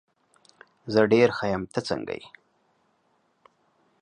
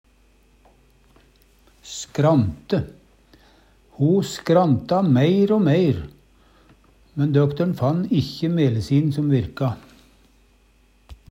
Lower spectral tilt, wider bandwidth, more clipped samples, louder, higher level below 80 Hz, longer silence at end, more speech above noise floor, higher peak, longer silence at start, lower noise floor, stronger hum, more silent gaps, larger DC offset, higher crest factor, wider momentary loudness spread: second, -6 dB/octave vs -7.5 dB/octave; second, 10 kHz vs 15.5 kHz; neither; second, -24 LUFS vs -20 LUFS; second, -60 dBFS vs -50 dBFS; first, 1.75 s vs 0.15 s; first, 45 dB vs 38 dB; about the same, -6 dBFS vs -4 dBFS; second, 0.85 s vs 1.85 s; first, -69 dBFS vs -57 dBFS; neither; neither; neither; about the same, 22 dB vs 18 dB; first, 17 LU vs 12 LU